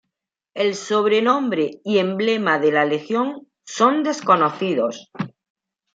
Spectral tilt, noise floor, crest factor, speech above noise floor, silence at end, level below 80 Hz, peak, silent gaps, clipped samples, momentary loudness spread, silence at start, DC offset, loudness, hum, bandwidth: -5 dB/octave; -82 dBFS; 18 dB; 63 dB; 0.65 s; -72 dBFS; -2 dBFS; none; under 0.1%; 15 LU; 0.55 s; under 0.1%; -19 LUFS; none; 7.8 kHz